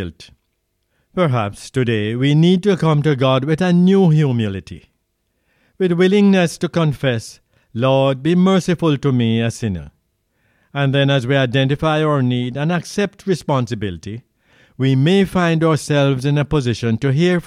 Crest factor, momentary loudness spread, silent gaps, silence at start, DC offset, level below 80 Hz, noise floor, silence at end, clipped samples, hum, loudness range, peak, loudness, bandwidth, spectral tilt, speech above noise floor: 14 dB; 11 LU; none; 0 s; under 0.1%; -46 dBFS; -69 dBFS; 0.05 s; under 0.1%; none; 3 LU; -4 dBFS; -16 LUFS; 12.5 kHz; -7 dB/octave; 53 dB